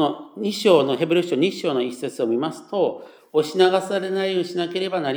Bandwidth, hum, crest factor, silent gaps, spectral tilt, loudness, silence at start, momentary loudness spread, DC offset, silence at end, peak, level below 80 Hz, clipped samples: over 20 kHz; none; 18 dB; none; -5 dB/octave; -22 LUFS; 0 s; 9 LU; under 0.1%; 0 s; -4 dBFS; -84 dBFS; under 0.1%